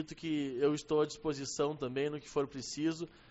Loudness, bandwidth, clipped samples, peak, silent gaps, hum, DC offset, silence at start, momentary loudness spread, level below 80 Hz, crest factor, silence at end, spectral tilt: -36 LUFS; 8 kHz; under 0.1%; -20 dBFS; none; none; under 0.1%; 0 s; 5 LU; -64 dBFS; 16 dB; 0.15 s; -5 dB/octave